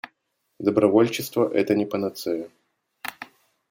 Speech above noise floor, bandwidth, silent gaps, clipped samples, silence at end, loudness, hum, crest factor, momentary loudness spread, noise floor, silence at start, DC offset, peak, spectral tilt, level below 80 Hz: 52 dB; 17 kHz; none; under 0.1%; 0.45 s; -23 LUFS; none; 20 dB; 23 LU; -74 dBFS; 0.05 s; under 0.1%; -4 dBFS; -5.5 dB/octave; -70 dBFS